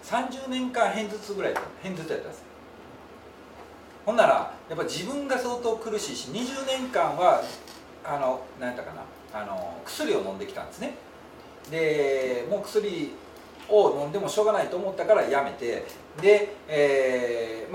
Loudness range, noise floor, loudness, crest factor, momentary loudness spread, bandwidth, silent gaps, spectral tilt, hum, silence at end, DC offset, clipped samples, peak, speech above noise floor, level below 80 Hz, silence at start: 8 LU; -47 dBFS; -27 LUFS; 20 dB; 24 LU; 16.5 kHz; none; -4 dB/octave; none; 0 s; under 0.1%; under 0.1%; -6 dBFS; 21 dB; -64 dBFS; 0 s